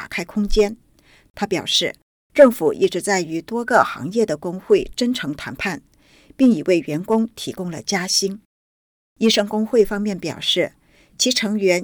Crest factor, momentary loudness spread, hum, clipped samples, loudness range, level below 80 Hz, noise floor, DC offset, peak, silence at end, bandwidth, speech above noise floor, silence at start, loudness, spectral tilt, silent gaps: 20 dB; 10 LU; none; under 0.1%; 3 LU; -40 dBFS; under -90 dBFS; under 0.1%; 0 dBFS; 0 s; over 20 kHz; over 71 dB; 0 s; -19 LUFS; -3.5 dB/octave; 1.30-1.34 s, 2.02-2.30 s, 8.45-9.16 s